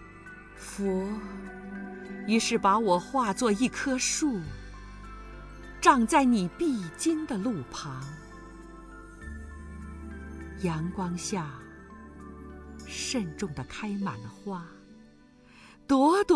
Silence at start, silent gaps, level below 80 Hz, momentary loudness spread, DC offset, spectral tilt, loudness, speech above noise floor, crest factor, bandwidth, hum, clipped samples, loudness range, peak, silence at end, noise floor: 0 s; none; -50 dBFS; 23 LU; under 0.1%; -4.5 dB/octave; -28 LUFS; 28 dB; 24 dB; 11 kHz; none; under 0.1%; 9 LU; -6 dBFS; 0 s; -56 dBFS